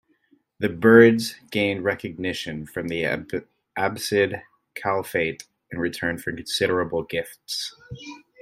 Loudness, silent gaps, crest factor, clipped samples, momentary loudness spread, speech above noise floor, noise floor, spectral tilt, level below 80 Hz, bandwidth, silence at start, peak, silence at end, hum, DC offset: -23 LUFS; none; 24 dB; under 0.1%; 19 LU; 41 dB; -63 dBFS; -5 dB/octave; -58 dBFS; 16 kHz; 0.6 s; 0 dBFS; 0.25 s; none; under 0.1%